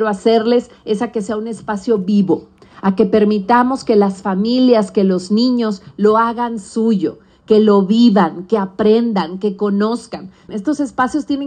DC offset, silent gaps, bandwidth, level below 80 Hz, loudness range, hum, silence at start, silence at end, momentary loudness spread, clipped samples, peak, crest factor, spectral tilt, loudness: under 0.1%; none; 9.4 kHz; -54 dBFS; 2 LU; none; 0 s; 0 s; 10 LU; under 0.1%; 0 dBFS; 14 dB; -7 dB/octave; -15 LUFS